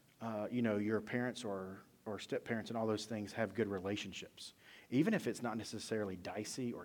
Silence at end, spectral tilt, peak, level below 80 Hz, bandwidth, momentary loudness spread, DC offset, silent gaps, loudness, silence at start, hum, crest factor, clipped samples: 0 s; -5.5 dB/octave; -22 dBFS; -78 dBFS; 18.5 kHz; 12 LU; under 0.1%; none; -40 LUFS; 0.2 s; none; 18 dB; under 0.1%